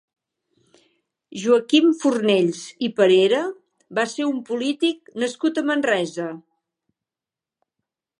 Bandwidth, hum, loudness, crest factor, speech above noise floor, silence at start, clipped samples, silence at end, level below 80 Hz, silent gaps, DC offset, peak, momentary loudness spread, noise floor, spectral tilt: 11 kHz; none; -21 LUFS; 18 dB; 69 dB; 1.3 s; under 0.1%; 1.8 s; -78 dBFS; none; under 0.1%; -4 dBFS; 12 LU; -89 dBFS; -4.5 dB/octave